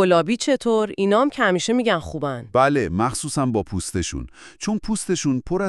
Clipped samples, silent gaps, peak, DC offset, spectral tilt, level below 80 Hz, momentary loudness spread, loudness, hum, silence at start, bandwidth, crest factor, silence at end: under 0.1%; none; -4 dBFS; under 0.1%; -5 dB/octave; -44 dBFS; 9 LU; -21 LUFS; none; 0 s; 13 kHz; 18 dB; 0 s